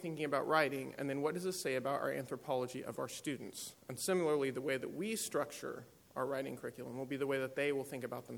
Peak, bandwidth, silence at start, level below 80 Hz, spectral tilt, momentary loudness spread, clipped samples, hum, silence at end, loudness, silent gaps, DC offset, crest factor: -18 dBFS; over 20 kHz; 0 s; -80 dBFS; -4.5 dB/octave; 12 LU; under 0.1%; none; 0 s; -39 LUFS; none; under 0.1%; 22 dB